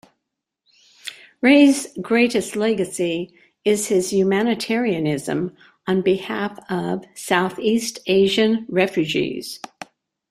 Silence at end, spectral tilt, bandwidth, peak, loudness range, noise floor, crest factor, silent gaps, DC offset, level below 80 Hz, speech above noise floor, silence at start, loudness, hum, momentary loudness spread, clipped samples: 0.75 s; -4.5 dB/octave; 15 kHz; -2 dBFS; 4 LU; -80 dBFS; 18 dB; none; under 0.1%; -62 dBFS; 61 dB; 1.05 s; -20 LUFS; none; 17 LU; under 0.1%